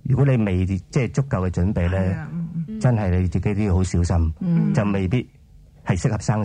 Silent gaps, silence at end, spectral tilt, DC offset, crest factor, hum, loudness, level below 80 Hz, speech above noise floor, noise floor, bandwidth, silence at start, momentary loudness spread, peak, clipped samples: none; 0 s; -7.5 dB/octave; under 0.1%; 14 dB; none; -22 LUFS; -40 dBFS; 28 dB; -48 dBFS; 9.8 kHz; 0.05 s; 7 LU; -6 dBFS; under 0.1%